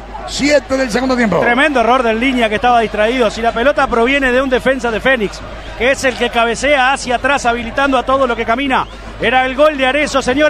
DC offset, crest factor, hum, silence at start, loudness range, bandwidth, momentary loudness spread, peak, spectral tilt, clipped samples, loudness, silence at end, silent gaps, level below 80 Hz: under 0.1%; 12 dB; none; 0 s; 2 LU; 13.5 kHz; 5 LU; 0 dBFS; -4 dB/octave; under 0.1%; -13 LUFS; 0 s; none; -34 dBFS